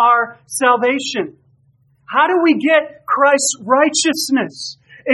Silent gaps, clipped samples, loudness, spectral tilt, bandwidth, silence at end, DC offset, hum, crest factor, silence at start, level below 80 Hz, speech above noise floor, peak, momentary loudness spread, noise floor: none; under 0.1%; -15 LUFS; -2 dB/octave; 13 kHz; 0 s; under 0.1%; none; 16 dB; 0 s; -70 dBFS; 41 dB; 0 dBFS; 12 LU; -56 dBFS